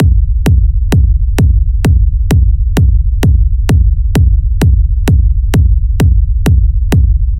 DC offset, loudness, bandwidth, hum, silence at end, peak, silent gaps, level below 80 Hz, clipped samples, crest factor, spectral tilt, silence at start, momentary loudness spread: under 0.1%; -11 LUFS; 14 kHz; none; 0 s; 0 dBFS; none; -10 dBFS; under 0.1%; 8 dB; -7.5 dB/octave; 0 s; 1 LU